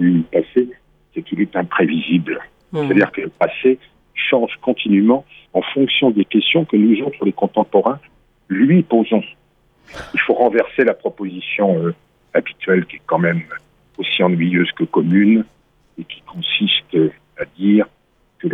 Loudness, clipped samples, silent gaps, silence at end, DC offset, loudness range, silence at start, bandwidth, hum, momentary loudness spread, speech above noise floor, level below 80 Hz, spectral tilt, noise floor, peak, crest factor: -17 LUFS; under 0.1%; none; 0 s; under 0.1%; 3 LU; 0 s; 6 kHz; none; 14 LU; 35 dB; -58 dBFS; -8.5 dB/octave; -51 dBFS; -2 dBFS; 16 dB